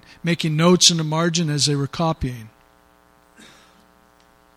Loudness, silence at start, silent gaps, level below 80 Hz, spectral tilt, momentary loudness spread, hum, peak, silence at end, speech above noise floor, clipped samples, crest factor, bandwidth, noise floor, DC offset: -18 LUFS; 0.25 s; none; -46 dBFS; -4 dB/octave; 14 LU; none; 0 dBFS; 2.1 s; 36 dB; under 0.1%; 22 dB; 15 kHz; -55 dBFS; under 0.1%